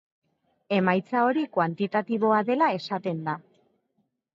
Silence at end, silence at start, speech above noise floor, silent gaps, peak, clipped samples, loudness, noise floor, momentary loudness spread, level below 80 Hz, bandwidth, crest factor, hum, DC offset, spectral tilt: 0.95 s; 0.7 s; 50 dB; none; -8 dBFS; under 0.1%; -25 LUFS; -74 dBFS; 7 LU; -76 dBFS; 7.4 kHz; 18 dB; none; under 0.1%; -8 dB/octave